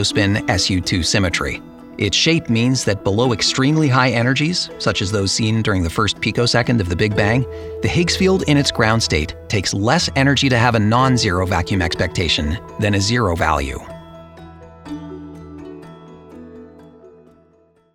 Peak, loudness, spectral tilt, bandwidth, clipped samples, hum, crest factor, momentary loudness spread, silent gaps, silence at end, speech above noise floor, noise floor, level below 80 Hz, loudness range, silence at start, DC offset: 0 dBFS; -17 LUFS; -4.5 dB/octave; 15.5 kHz; under 0.1%; none; 18 dB; 17 LU; none; 0.85 s; 38 dB; -55 dBFS; -36 dBFS; 11 LU; 0 s; under 0.1%